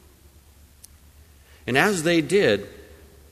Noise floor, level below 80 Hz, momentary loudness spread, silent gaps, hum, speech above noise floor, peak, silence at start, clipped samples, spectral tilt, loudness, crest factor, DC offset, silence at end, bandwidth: -52 dBFS; -52 dBFS; 14 LU; none; none; 32 dB; -4 dBFS; 1.65 s; under 0.1%; -4.5 dB/octave; -21 LUFS; 22 dB; under 0.1%; 0.5 s; 15 kHz